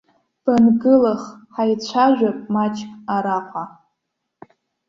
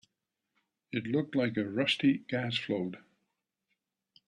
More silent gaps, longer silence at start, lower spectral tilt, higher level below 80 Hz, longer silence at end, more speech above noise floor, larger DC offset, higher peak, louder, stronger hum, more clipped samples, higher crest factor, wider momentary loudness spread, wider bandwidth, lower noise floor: neither; second, 0.45 s vs 0.95 s; about the same, -6.5 dB/octave vs -6 dB/octave; first, -60 dBFS vs -74 dBFS; about the same, 1.2 s vs 1.3 s; first, 59 dB vs 54 dB; neither; first, -4 dBFS vs -16 dBFS; first, -18 LUFS vs -32 LUFS; neither; neither; about the same, 16 dB vs 18 dB; first, 16 LU vs 11 LU; second, 7.4 kHz vs 11 kHz; second, -77 dBFS vs -86 dBFS